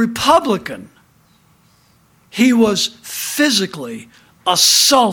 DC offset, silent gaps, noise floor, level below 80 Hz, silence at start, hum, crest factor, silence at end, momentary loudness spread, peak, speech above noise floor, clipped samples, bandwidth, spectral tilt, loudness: under 0.1%; none; -54 dBFS; -54 dBFS; 0 s; none; 16 dB; 0 s; 20 LU; 0 dBFS; 39 dB; under 0.1%; 19.5 kHz; -2 dB/octave; -14 LUFS